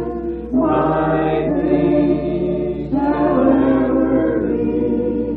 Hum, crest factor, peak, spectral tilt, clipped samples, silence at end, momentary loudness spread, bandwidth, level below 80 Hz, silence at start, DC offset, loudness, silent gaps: none; 14 dB; -2 dBFS; -11.5 dB/octave; under 0.1%; 0 s; 6 LU; 4.4 kHz; -36 dBFS; 0 s; under 0.1%; -17 LUFS; none